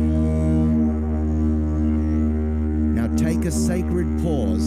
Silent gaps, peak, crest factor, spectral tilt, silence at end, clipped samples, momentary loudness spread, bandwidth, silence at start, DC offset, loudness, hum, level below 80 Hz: none; -12 dBFS; 8 dB; -8 dB/octave; 0 s; under 0.1%; 3 LU; 14 kHz; 0 s; under 0.1%; -21 LUFS; none; -28 dBFS